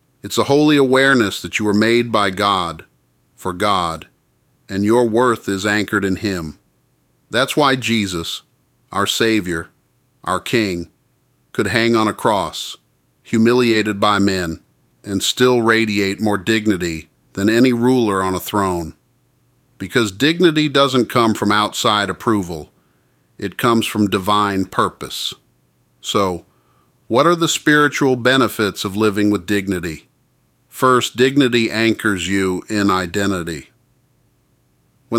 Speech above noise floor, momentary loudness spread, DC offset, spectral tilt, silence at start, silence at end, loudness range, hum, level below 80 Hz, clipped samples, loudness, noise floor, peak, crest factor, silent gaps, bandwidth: 44 dB; 14 LU; under 0.1%; -4.5 dB/octave; 0.25 s; 0 s; 4 LU; none; -50 dBFS; under 0.1%; -17 LUFS; -61 dBFS; 0 dBFS; 16 dB; none; 17 kHz